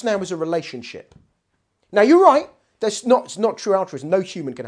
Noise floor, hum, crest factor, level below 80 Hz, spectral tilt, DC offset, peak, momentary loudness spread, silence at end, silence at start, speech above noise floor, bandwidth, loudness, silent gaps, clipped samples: -71 dBFS; none; 20 dB; -68 dBFS; -5 dB/octave; under 0.1%; 0 dBFS; 19 LU; 0 s; 0 s; 52 dB; 10.5 kHz; -19 LUFS; none; under 0.1%